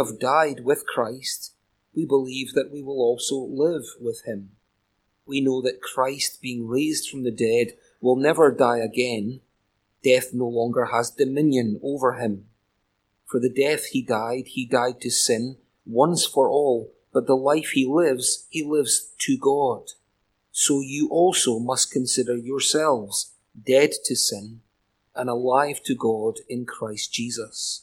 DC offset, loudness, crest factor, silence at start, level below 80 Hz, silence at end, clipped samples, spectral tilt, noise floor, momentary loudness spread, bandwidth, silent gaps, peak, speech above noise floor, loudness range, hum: under 0.1%; -23 LUFS; 20 dB; 0 s; -68 dBFS; 0.05 s; under 0.1%; -3.5 dB/octave; -72 dBFS; 11 LU; 17 kHz; none; -4 dBFS; 49 dB; 5 LU; none